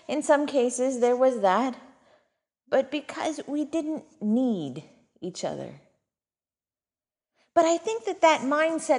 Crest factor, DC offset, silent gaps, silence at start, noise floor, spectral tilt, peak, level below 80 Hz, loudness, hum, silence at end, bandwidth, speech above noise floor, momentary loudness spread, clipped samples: 20 dB; under 0.1%; none; 0.1 s; under -90 dBFS; -4 dB/octave; -6 dBFS; -74 dBFS; -25 LUFS; none; 0 s; 11 kHz; over 65 dB; 15 LU; under 0.1%